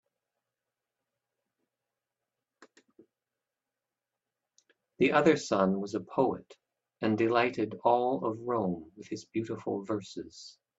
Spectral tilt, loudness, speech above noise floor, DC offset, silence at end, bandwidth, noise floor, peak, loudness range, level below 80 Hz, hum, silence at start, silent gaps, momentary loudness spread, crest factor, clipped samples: -6 dB/octave; -30 LUFS; 60 dB; under 0.1%; 0.3 s; 8 kHz; -90 dBFS; -10 dBFS; 4 LU; -74 dBFS; none; 2.6 s; none; 17 LU; 22 dB; under 0.1%